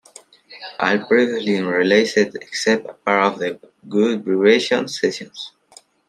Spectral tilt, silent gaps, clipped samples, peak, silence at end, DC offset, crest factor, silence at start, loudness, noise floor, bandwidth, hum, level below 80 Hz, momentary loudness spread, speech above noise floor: -4.5 dB/octave; none; under 0.1%; 0 dBFS; 0.6 s; under 0.1%; 18 dB; 0.5 s; -18 LUFS; -50 dBFS; 12 kHz; none; -68 dBFS; 17 LU; 32 dB